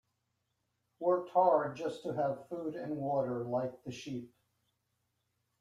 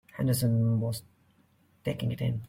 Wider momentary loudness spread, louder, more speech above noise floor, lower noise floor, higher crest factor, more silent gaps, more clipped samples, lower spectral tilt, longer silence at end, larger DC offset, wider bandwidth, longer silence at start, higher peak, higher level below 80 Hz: first, 14 LU vs 11 LU; second, -34 LUFS vs -30 LUFS; first, 49 dB vs 37 dB; first, -82 dBFS vs -65 dBFS; first, 20 dB vs 14 dB; neither; neither; about the same, -7 dB/octave vs -6.5 dB/octave; first, 1.35 s vs 0 s; neither; second, 11.5 kHz vs 16.5 kHz; first, 1 s vs 0.15 s; about the same, -16 dBFS vs -16 dBFS; second, -78 dBFS vs -58 dBFS